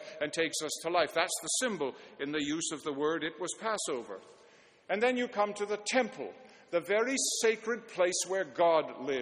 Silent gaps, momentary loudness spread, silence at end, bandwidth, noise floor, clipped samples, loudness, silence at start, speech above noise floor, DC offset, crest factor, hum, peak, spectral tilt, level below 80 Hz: none; 9 LU; 0 s; 12 kHz; -61 dBFS; under 0.1%; -32 LUFS; 0 s; 28 dB; under 0.1%; 20 dB; none; -12 dBFS; -2 dB/octave; -76 dBFS